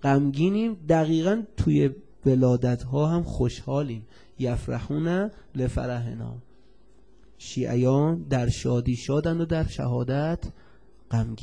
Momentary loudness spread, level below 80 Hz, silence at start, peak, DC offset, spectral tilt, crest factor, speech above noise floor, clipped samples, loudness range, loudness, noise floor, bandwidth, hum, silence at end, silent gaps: 10 LU; -42 dBFS; 0 s; -8 dBFS; 0.3%; -7.5 dB/octave; 16 dB; 33 dB; under 0.1%; 7 LU; -26 LUFS; -58 dBFS; 10 kHz; none; 0 s; none